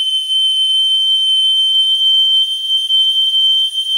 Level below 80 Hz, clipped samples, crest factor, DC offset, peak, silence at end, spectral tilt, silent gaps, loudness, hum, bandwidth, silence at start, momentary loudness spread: under -90 dBFS; under 0.1%; 6 dB; under 0.1%; -6 dBFS; 0 s; 7 dB/octave; none; -10 LUFS; none; 16 kHz; 0 s; 3 LU